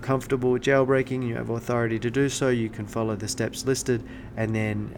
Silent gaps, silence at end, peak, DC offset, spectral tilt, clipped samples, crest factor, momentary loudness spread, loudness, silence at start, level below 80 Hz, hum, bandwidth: none; 0 s; -8 dBFS; under 0.1%; -5.5 dB/octave; under 0.1%; 18 dB; 8 LU; -26 LUFS; 0 s; -48 dBFS; none; 18.5 kHz